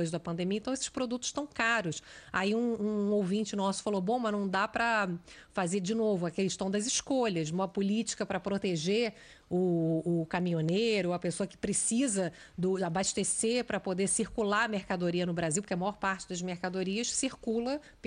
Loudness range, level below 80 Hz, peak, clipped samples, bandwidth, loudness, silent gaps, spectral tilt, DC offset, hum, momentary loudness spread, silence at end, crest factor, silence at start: 1 LU; -62 dBFS; -16 dBFS; under 0.1%; 10.5 kHz; -31 LUFS; none; -4 dB/octave; under 0.1%; none; 6 LU; 0 s; 16 dB; 0 s